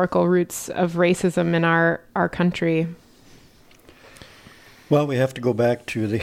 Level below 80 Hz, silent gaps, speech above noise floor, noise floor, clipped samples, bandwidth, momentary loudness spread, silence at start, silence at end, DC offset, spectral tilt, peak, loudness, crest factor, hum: -56 dBFS; none; 31 dB; -51 dBFS; under 0.1%; 15 kHz; 6 LU; 0 s; 0 s; under 0.1%; -6 dB/octave; -6 dBFS; -21 LUFS; 16 dB; none